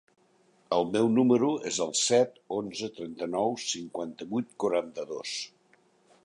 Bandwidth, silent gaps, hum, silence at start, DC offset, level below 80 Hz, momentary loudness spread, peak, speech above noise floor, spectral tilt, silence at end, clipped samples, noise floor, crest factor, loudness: 11 kHz; none; none; 0.7 s; under 0.1%; -72 dBFS; 13 LU; -10 dBFS; 37 dB; -4 dB/octave; 0.75 s; under 0.1%; -65 dBFS; 18 dB; -29 LUFS